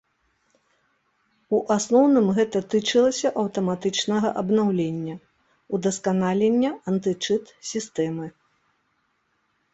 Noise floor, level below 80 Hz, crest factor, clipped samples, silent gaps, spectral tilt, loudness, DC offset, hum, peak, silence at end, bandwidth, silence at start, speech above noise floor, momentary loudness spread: -70 dBFS; -64 dBFS; 18 dB; under 0.1%; none; -5 dB/octave; -23 LUFS; under 0.1%; none; -6 dBFS; 1.45 s; 8.2 kHz; 1.5 s; 48 dB; 12 LU